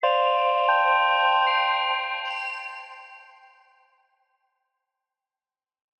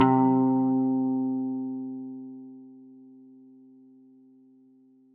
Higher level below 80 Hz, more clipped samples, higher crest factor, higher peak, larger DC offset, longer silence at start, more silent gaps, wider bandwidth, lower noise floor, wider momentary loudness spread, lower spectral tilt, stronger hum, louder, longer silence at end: second, under -90 dBFS vs -82 dBFS; neither; about the same, 16 dB vs 20 dB; about the same, -10 dBFS vs -8 dBFS; neither; about the same, 0 s vs 0 s; neither; first, 8.4 kHz vs 3.3 kHz; first, under -90 dBFS vs -58 dBFS; second, 17 LU vs 24 LU; second, 2.5 dB/octave vs -7.5 dB/octave; neither; first, -22 LUFS vs -26 LUFS; first, 2.8 s vs 2.3 s